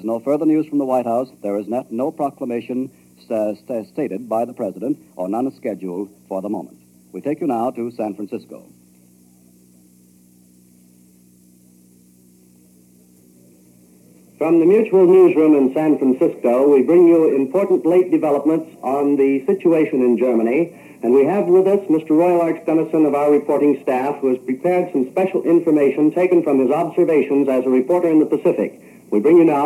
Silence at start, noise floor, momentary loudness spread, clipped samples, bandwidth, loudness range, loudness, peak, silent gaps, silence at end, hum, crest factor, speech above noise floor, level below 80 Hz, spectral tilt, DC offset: 0 s; -51 dBFS; 13 LU; under 0.1%; 13 kHz; 12 LU; -17 LUFS; -4 dBFS; none; 0 s; none; 14 dB; 34 dB; -74 dBFS; -8.5 dB/octave; under 0.1%